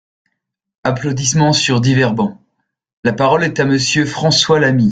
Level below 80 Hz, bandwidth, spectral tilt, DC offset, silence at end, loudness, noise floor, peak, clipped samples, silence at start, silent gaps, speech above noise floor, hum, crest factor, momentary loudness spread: -50 dBFS; 9.4 kHz; -4.5 dB/octave; under 0.1%; 0 s; -14 LUFS; -74 dBFS; 0 dBFS; under 0.1%; 0.85 s; 2.93-3.03 s; 61 dB; none; 14 dB; 8 LU